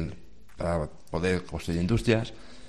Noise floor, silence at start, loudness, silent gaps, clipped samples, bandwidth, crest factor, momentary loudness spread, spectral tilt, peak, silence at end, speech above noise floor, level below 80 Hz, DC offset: -48 dBFS; 0 s; -29 LUFS; none; under 0.1%; 13 kHz; 22 dB; 10 LU; -6.5 dB/octave; -6 dBFS; 0 s; 20 dB; -44 dBFS; 0.7%